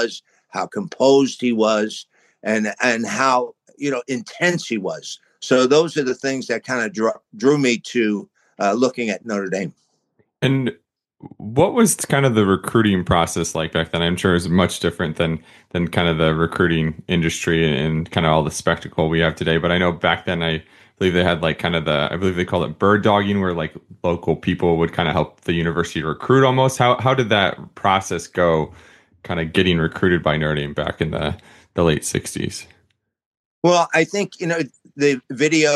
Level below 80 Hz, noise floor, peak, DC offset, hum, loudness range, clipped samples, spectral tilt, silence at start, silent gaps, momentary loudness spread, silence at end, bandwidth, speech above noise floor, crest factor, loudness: -44 dBFS; -65 dBFS; -2 dBFS; under 0.1%; none; 3 LU; under 0.1%; -5 dB/octave; 0 s; 33.26-33.62 s; 10 LU; 0 s; 12.5 kHz; 46 dB; 18 dB; -19 LUFS